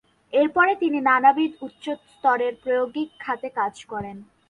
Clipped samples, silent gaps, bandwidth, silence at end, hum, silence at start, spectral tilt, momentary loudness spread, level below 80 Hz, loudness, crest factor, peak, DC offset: under 0.1%; none; 10.5 kHz; 0.25 s; none; 0.35 s; -5.5 dB/octave; 16 LU; -64 dBFS; -22 LUFS; 18 dB; -4 dBFS; under 0.1%